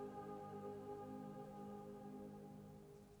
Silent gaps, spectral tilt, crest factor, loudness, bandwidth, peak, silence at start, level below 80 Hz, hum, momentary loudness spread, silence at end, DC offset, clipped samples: none; -7.5 dB/octave; 14 dB; -54 LUFS; over 20 kHz; -40 dBFS; 0 s; -76 dBFS; none; 7 LU; 0 s; under 0.1%; under 0.1%